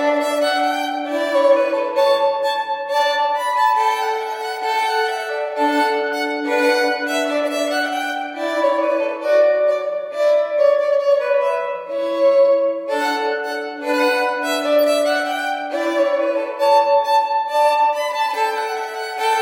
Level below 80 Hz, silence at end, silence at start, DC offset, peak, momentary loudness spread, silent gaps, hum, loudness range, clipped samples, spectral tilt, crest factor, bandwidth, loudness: -76 dBFS; 0 s; 0 s; under 0.1%; -4 dBFS; 7 LU; none; none; 2 LU; under 0.1%; -1.5 dB/octave; 14 dB; 16 kHz; -18 LUFS